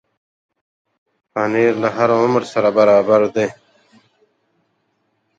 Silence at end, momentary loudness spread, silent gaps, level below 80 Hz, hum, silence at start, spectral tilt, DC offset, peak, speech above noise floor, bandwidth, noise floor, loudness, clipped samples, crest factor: 1.85 s; 10 LU; none; -62 dBFS; none; 1.35 s; -6.5 dB/octave; under 0.1%; -2 dBFS; 52 dB; 8 kHz; -67 dBFS; -16 LUFS; under 0.1%; 18 dB